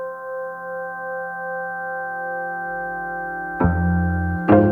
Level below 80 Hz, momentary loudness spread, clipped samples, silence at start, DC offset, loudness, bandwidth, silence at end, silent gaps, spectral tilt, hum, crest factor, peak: -38 dBFS; 10 LU; under 0.1%; 0 s; under 0.1%; -24 LUFS; 3.5 kHz; 0 s; none; -10.5 dB/octave; none; 20 dB; -2 dBFS